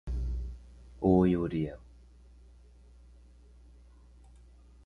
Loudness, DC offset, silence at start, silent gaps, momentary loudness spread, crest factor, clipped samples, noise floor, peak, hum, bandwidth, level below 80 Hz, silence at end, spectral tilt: -30 LUFS; under 0.1%; 0.05 s; none; 22 LU; 22 dB; under 0.1%; -56 dBFS; -12 dBFS; 60 Hz at -50 dBFS; 6.4 kHz; -42 dBFS; 3 s; -10 dB/octave